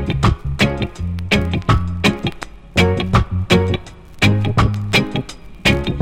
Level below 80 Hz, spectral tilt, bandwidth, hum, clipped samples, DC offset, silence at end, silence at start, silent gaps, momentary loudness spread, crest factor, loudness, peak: -28 dBFS; -5.5 dB/octave; 16 kHz; none; under 0.1%; under 0.1%; 0 s; 0 s; none; 9 LU; 16 dB; -17 LUFS; 0 dBFS